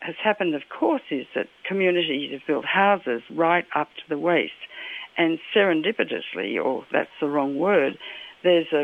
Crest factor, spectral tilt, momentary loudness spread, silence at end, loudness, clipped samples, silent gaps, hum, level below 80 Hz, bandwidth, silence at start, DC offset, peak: 18 dB; -7 dB/octave; 10 LU; 0 s; -24 LUFS; under 0.1%; none; none; -70 dBFS; 4.7 kHz; 0 s; under 0.1%; -6 dBFS